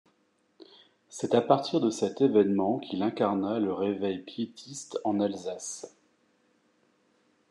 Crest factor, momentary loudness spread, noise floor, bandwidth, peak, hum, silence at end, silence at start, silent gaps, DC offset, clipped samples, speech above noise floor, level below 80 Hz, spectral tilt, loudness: 22 dB; 13 LU; -70 dBFS; 11.5 kHz; -8 dBFS; none; 1.6 s; 0.6 s; none; under 0.1%; under 0.1%; 42 dB; -82 dBFS; -5.5 dB/octave; -28 LUFS